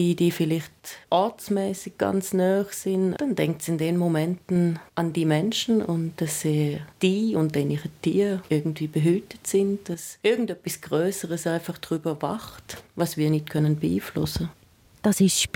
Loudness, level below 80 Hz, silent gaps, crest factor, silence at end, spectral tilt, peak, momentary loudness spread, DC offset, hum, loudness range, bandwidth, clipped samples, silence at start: -25 LUFS; -56 dBFS; none; 16 dB; 0.1 s; -5.5 dB/octave; -8 dBFS; 7 LU; under 0.1%; none; 3 LU; 17.5 kHz; under 0.1%; 0 s